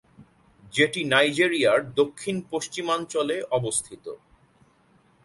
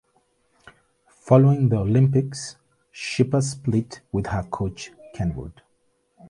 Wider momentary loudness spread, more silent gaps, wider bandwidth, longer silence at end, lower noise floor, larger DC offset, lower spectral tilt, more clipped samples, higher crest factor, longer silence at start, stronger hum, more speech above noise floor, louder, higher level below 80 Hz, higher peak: second, 13 LU vs 19 LU; neither; about the same, 11.5 kHz vs 11.5 kHz; first, 1.1 s vs 0.05 s; second, -61 dBFS vs -68 dBFS; neither; second, -3.5 dB/octave vs -7 dB/octave; neither; about the same, 22 dB vs 20 dB; second, 0.2 s vs 1.25 s; neither; second, 37 dB vs 47 dB; about the same, -24 LUFS vs -22 LUFS; second, -64 dBFS vs -46 dBFS; about the same, -4 dBFS vs -2 dBFS